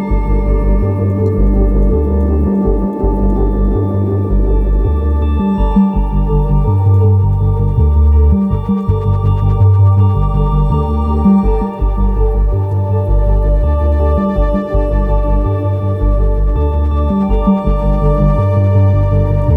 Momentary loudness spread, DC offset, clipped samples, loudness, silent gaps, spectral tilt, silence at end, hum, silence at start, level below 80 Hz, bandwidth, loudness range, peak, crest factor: 5 LU; under 0.1%; under 0.1%; -13 LUFS; none; -11.5 dB/octave; 0 s; none; 0 s; -14 dBFS; 3.7 kHz; 2 LU; 0 dBFS; 10 dB